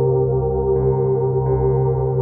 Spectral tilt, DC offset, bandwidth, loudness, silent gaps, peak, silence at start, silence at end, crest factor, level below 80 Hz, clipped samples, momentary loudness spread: -15 dB/octave; under 0.1%; 2.2 kHz; -18 LUFS; none; -8 dBFS; 0 s; 0 s; 10 dB; -32 dBFS; under 0.1%; 1 LU